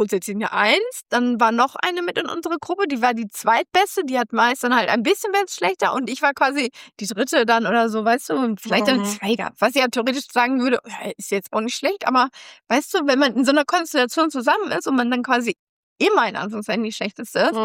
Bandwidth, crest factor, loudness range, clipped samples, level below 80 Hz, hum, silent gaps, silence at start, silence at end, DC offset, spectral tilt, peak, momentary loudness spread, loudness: 16.5 kHz; 16 dB; 2 LU; under 0.1%; -72 dBFS; none; 15.59-15.96 s; 0 s; 0 s; under 0.1%; -3.5 dB/octave; -4 dBFS; 7 LU; -20 LUFS